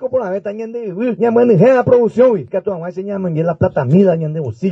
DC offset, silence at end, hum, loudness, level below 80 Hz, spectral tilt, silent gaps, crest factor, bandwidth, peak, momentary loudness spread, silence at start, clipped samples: under 0.1%; 0 s; none; -15 LUFS; -52 dBFS; -9.5 dB/octave; none; 14 dB; 7.4 kHz; 0 dBFS; 13 LU; 0 s; under 0.1%